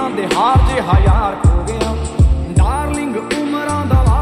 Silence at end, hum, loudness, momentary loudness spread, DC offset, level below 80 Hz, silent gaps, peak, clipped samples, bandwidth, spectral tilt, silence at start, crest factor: 0 s; none; -15 LUFS; 7 LU; under 0.1%; -18 dBFS; none; -2 dBFS; under 0.1%; 11.5 kHz; -6.5 dB/octave; 0 s; 12 dB